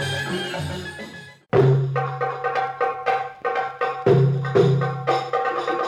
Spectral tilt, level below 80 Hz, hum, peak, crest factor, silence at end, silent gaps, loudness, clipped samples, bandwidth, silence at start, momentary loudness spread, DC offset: -7 dB/octave; -56 dBFS; none; -4 dBFS; 18 dB; 0 s; none; -22 LUFS; under 0.1%; 11 kHz; 0 s; 12 LU; under 0.1%